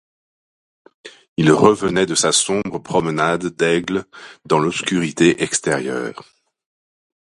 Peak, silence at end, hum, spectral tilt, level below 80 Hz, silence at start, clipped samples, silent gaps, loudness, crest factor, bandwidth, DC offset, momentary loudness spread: 0 dBFS; 1.25 s; none; -4 dB/octave; -54 dBFS; 1.05 s; under 0.1%; 1.28-1.36 s; -17 LUFS; 20 dB; 11.5 kHz; under 0.1%; 11 LU